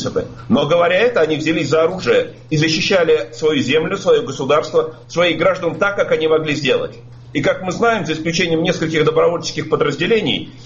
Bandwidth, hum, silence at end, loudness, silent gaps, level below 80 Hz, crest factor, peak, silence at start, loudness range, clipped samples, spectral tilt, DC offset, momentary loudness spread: 7.6 kHz; none; 0 s; -16 LUFS; none; -48 dBFS; 14 dB; -4 dBFS; 0 s; 2 LU; under 0.1%; -5 dB/octave; under 0.1%; 6 LU